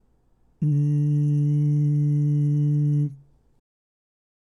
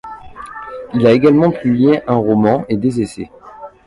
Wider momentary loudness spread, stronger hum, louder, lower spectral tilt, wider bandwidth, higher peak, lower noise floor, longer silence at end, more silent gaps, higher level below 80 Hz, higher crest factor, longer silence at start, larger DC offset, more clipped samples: second, 4 LU vs 21 LU; neither; second, -22 LUFS vs -14 LUFS; first, -11 dB/octave vs -8 dB/octave; second, 2 kHz vs 11.5 kHz; second, -16 dBFS vs 0 dBFS; first, -61 dBFS vs -36 dBFS; first, 1.4 s vs 0.2 s; neither; second, -64 dBFS vs -46 dBFS; second, 8 dB vs 14 dB; first, 0.6 s vs 0.05 s; neither; neither